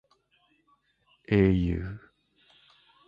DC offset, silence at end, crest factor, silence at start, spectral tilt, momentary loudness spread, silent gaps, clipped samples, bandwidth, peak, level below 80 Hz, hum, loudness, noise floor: under 0.1%; 1.1 s; 20 dB; 1.3 s; -10 dB/octave; 18 LU; none; under 0.1%; 5.2 kHz; -10 dBFS; -44 dBFS; none; -26 LUFS; -69 dBFS